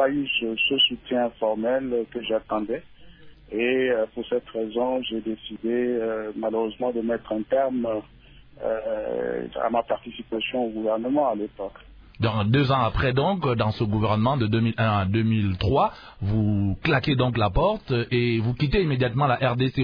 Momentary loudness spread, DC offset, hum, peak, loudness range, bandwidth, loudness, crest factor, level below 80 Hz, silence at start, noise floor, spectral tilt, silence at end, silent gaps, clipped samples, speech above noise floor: 7 LU; under 0.1%; none; -8 dBFS; 4 LU; 5.2 kHz; -24 LUFS; 16 dB; -42 dBFS; 0 s; -46 dBFS; -9 dB/octave; 0 s; none; under 0.1%; 22 dB